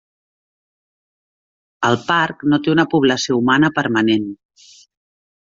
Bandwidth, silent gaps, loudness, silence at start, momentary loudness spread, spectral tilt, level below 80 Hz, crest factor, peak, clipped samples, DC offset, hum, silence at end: 7.6 kHz; none; -16 LUFS; 1.8 s; 5 LU; -5 dB/octave; -58 dBFS; 16 dB; -2 dBFS; under 0.1%; under 0.1%; none; 1.2 s